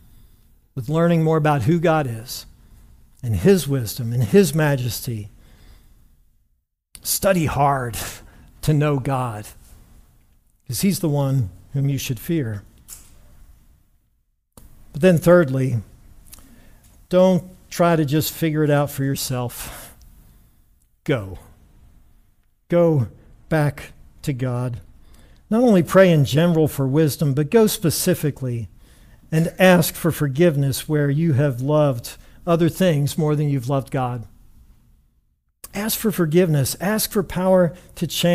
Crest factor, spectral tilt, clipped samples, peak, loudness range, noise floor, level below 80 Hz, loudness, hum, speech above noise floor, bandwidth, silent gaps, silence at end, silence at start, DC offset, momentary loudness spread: 18 dB; -6 dB/octave; under 0.1%; -2 dBFS; 7 LU; -68 dBFS; -46 dBFS; -20 LUFS; none; 49 dB; 16 kHz; none; 0 s; 0.75 s; under 0.1%; 16 LU